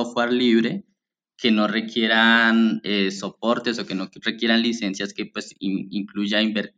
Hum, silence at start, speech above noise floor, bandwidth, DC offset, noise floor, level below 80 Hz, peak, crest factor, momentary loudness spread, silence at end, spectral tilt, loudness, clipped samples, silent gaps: none; 0 s; 51 dB; 9 kHz; under 0.1%; -73 dBFS; -72 dBFS; -4 dBFS; 18 dB; 13 LU; 0.1 s; -4.5 dB/octave; -21 LUFS; under 0.1%; none